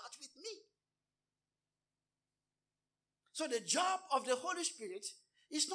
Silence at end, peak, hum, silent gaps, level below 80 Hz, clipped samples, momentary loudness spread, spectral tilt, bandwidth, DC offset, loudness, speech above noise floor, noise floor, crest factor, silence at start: 0 s; -20 dBFS; none; none; under -90 dBFS; under 0.1%; 16 LU; -0.5 dB/octave; 10.5 kHz; under 0.1%; -38 LUFS; over 52 dB; under -90 dBFS; 22 dB; 0 s